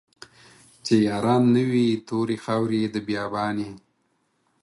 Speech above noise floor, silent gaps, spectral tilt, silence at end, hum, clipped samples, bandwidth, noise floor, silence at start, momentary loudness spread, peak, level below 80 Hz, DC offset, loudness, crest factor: 48 dB; none; -6.5 dB/octave; 0.85 s; none; under 0.1%; 11.5 kHz; -70 dBFS; 0.85 s; 9 LU; -6 dBFS; -62 dBFS; under 0.1%; -23 LUFS; 18 dB